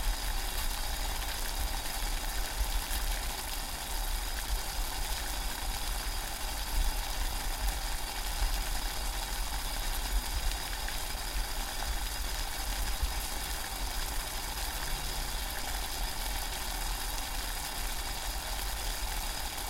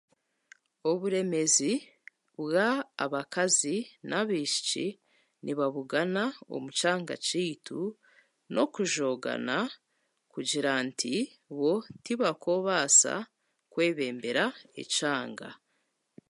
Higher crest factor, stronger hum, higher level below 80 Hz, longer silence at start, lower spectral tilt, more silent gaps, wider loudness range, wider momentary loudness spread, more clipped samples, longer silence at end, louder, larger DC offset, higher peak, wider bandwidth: about the same, 18 dB vs 22 dB; neither; first, -36 dBFS vs -82 dBFS; second, 0 s vs 0.85 s; about the same, -2 dB/octave vs -2.5 dB/octave; neither; second, 0 LU vs 5 LU; second, 2 LU vs 12 LU; neither; second, 0 s vs 0.75 s; second, -35 LUFS vs -29 LUFS; neither; second, -14 dBFS vs -10 dBFS; first, 17 kHz vs 11.5 kHz